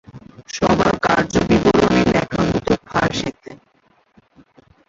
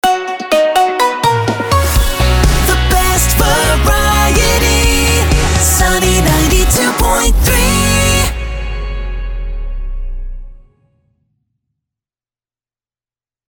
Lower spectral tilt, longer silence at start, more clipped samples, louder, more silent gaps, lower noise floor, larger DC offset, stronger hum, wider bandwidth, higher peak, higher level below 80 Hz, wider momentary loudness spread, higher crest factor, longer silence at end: first, -5.5 dB/octave vs -3.5 dB/octave; about the same, 0.15 s vs 0.05 s; neither; second, -17 LUFS vs -11 LUFS; neither; second, -59 dBFS vs under -90 dBFS; neither; neither; second, 7.8 kHz vs over 20 kHz; about the same, -2 dBFS vs 0 dBFS; second, -38 dBFS vs -16 dBFS; second, 7 LU vs 14 LU; first, 18 dB vs 12 dB; second, 1.35 s vs 2.95 s